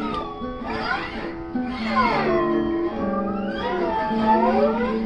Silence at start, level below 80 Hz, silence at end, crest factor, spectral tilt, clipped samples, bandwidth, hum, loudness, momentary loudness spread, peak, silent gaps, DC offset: 0 s; -42 dBFS; 0 s; 16 dB; -7.5 dB/octave; under 0.1%; 8 kHz; none; -23 LUFS; 10 LU; -6 dBFS; none; under 0.1%